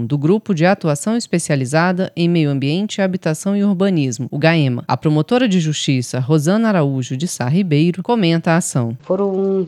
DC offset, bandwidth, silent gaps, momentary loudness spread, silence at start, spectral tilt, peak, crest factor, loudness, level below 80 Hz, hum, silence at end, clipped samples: under 0.1%; 13.5 kHz; none; 5 LU; 0 s; -6 dB/octave; 0 dBFS; 16 dB; -17 LUFS; -66 dBFS; none; 0 s; under 0.1%